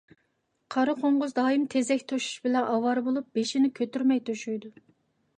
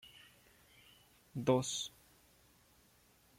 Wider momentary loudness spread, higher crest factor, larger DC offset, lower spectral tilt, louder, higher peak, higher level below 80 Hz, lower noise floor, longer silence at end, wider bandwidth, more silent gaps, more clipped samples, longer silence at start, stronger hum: second, 7 LU vs 28 LU; second, 16 dB vs 24 dB; neither; about the same, -4 dB/octave vs -4.5 dB/octave; first, -27 LUFS vs -37 LUFS; first, -12 dBFS vs -18 dBFS; about the same, -78 dBFS vs -74 dBFS; first, -74 dBFS vs -69 dBFS; second, 0.7 s vs 1.5 s; second, 10 kHz vs 16.5 kHz; neither; neither; first, 0.7 s vs 0.05 s; neither